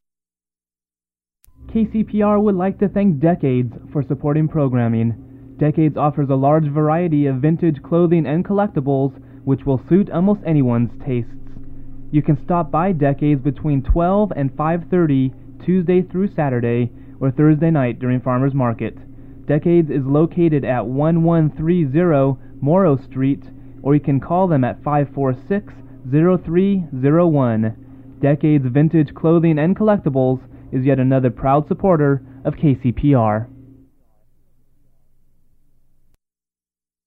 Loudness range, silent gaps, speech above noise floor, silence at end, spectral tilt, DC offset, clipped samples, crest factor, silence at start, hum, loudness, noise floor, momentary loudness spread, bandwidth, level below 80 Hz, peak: 3 LU; none; over 74 dB; 3.6 s; -12 dB/octave; under 0.1%; under 0.1%; 14 dB; 1.6 s; none; -17 LUFS; under -90 dBFS; 8 LU; 4 kHz; -38 dBFS; -2 dBFS